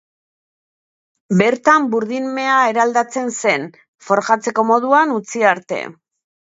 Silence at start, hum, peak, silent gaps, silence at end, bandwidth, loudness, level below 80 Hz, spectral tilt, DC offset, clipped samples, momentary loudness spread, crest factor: 1.3 s; none; 0 dBFS; 3.88-3.93 s; 0.6 s; 8 kHz; -16 LUFS; -68 dBFS; -4.5 dB/octave; under 0.1%; under 0.1%; 8 LU; 18 dB